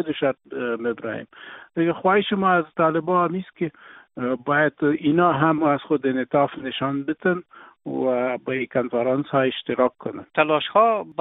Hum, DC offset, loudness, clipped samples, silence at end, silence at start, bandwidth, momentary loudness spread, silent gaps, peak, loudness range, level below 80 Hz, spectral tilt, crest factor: none; under 0.1%; -22 LUFS; under 0.1%; 0.1 s; 0 s; 4 kHz; 11 LU; none; -2 dBFS; 3 LU; -64 dBFS; -4.5 dB/octave; 20 dB